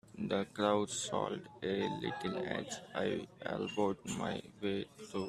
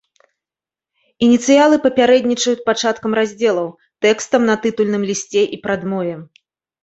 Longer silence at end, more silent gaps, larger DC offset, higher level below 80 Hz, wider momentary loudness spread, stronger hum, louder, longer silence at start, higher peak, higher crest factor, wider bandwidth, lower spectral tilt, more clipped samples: second, 0 s vs 0.6 s; neither; neither; second, -70 dBFS vs -58 dBFS; about the same, 8 LU vs 10 LU; neither; second, -38 LUFS vs -16 LUFS; second, 0.05 s vs 1.2 s; second, -16 dBFS vs -2 dBFS; first, 22 dB vs 16 dB; first, 14 kHz vs 8.2 kHz; about the same, -4.5 dB/octave vs -4 dB/octave; neither